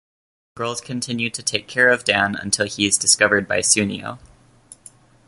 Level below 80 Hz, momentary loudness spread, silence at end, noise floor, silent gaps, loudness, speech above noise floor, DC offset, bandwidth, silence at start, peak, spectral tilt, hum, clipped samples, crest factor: -54 dBFS; 12 LU; 1 s; -48 dBFS; none; -18 LUFS; 29 dB; under 0.1%; 12 kHz; 0.55 s; 0 dBFS; -2 dB/octave; none; under 0.1%; 22 dB